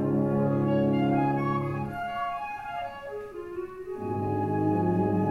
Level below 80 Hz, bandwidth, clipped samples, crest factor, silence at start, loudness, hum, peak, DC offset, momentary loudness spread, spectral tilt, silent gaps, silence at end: -56 dBFS; 12 kHz; under 0.1%; 14 dB; 0 s; -28 LUFS; none; -14 dBFS; under 0.1%; 13 LU; -9.5 dB/octave; none; 0 s